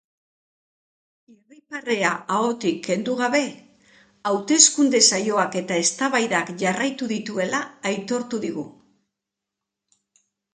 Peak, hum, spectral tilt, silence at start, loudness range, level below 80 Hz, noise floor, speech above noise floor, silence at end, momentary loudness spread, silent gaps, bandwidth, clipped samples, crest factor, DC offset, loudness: 0 dBFS; none; -2 dB/octave; 1.7 s; 9 LU; -72 dBFS; -85 dBFS; 62 dB; 1.85 s; 14 LU; none; 9.8 kHz; under 0.1%; 24 dB; under 0.1%; -21 LUFS